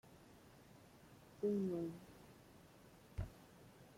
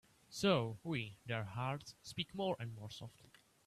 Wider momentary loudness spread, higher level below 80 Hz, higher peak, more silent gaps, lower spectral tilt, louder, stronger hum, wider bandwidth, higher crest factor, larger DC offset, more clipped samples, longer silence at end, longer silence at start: first, 23 LU vs 16 LU; first, -64 dBFS vs -72 dBFS; second, -30 dBFS vs -20 dBFS; neither; first, -8 dB/octave vs -5.5 dB/octave; second, -45 LUFS vs -41 LUFS; neither; first, 16.5 kHz vs 14 kHz; about the same, 18 dB vs 22 dB; neither; neither; second, 0 s vs 0.45 s; second, 0.05 s vs 0.3 s